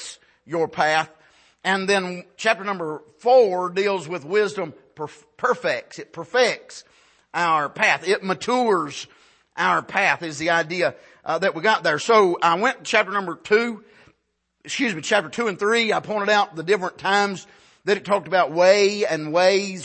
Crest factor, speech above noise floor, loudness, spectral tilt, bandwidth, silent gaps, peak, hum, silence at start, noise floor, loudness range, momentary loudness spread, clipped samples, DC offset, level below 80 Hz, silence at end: 18 dB; 51 dB; -21 LUFS; -3.5 dB/octave; 8.8 kHz; none; -4 dBFS; none; 0 s; -72 dBFS; 4 LU; 15 LU; under 0.1%; under 0.1%; -70 dBFS; 0 s